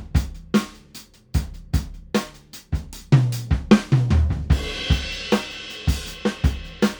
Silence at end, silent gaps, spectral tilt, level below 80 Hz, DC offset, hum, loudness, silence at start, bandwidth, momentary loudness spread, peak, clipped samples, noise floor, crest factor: 0 s; none; -6 dB/octave; -28 dBFS; under 0.1%; none; -23 LUFS; 0 s; over 20 kHz; 13 LU; 0 dBFS; under 0.1%; -45 dBFS; 22 dB